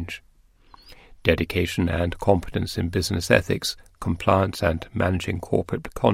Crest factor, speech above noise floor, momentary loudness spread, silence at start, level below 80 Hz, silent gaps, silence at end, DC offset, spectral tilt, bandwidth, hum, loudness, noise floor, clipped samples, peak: 22 dB; 33 dB; 9 LU; 0 s; -40 dBFS; none; 0 s; under 0.1%; -5.5 dB/octave; 16 kHz; none; -24 LUFS; -56 dBFS; under 0.1%; 0 dBFS